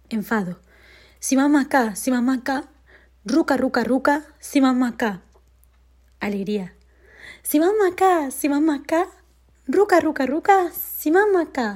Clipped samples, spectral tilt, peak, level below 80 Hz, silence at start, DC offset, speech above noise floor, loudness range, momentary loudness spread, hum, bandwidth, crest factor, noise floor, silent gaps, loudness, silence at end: under 0.1%; -4.5 dB/octave; -4 dBFS; -56 dBFS; 0.1 s; under 0.1%; 35 dB; 5 LU; 11 LU; none; 16.5 kHz; 18 dB; -55 dBFS; none; -21 LUFS; 0 s